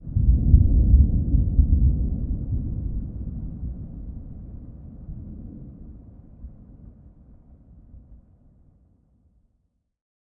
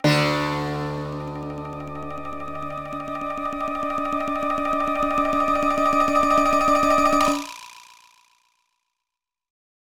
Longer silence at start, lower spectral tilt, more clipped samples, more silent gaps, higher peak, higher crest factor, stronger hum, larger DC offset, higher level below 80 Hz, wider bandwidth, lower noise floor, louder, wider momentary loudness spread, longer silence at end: about the same, 0 s vs 0 s; first, -16 dB/octave vs -5 dB/octave; neither; neither; first, -2 dBFS vs -6 dBFS; about the same, 22 dB vs 18 dB; neither; neither; first, -26 dBFS vs -48 dBFS; second, 0.9 kHz vs 19.5 kHz; second, -71 dBFS vs -86 dBFS; about the same, -23 LUFS vs -23 LUFS; first, 25 LU vs 15 LU; first, 2.15 s vs 0.5 s